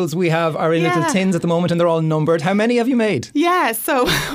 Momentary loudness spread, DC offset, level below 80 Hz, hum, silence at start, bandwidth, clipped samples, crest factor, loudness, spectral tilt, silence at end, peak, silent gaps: 2 LU; under 0.1%; -46 dBFS; none; 0 s; 16 kHz; under 0.1%; 14 dB; -17 LUFS; -5.5 dB/octave; 0 s; -4 dBFS; none